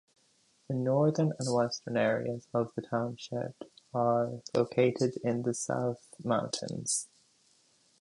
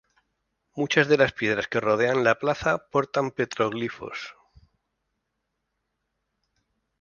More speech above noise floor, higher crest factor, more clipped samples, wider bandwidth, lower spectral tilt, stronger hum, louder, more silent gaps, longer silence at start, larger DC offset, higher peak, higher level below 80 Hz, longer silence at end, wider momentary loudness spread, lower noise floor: second, 38 dB vs 55 dB; second, 18 dB vs 24 dB; neither; first, 11.5 kHz vs 7.2 kHz; about the same, -5 dB/octave vs -5 dB/octave; neither; second, -32 LUFS vs -24 LUFS; neither; about the same, 0.7 s vs 0.75 s; neither; second, -14 dBFS vs -4 dBFS; second, -72 dBFS vs -60 dBFS; second, 0.95 s vs 2.7 s; second, 10 LU vs 15 LU; second, -69 dBFS vs -79 dBFS